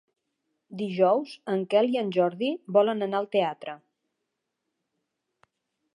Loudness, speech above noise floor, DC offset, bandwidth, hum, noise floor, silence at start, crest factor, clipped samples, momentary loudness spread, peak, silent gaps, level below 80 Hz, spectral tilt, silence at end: -26 LUFS; 57 dB; under 0.1%; 10.5 kHz; none; -82 dBFS; 0.7 s; 20 dB; under 0.1%; 15 LU; -8 dBFS; none; -84 dBFS; -7 dB/octave; 2.2 s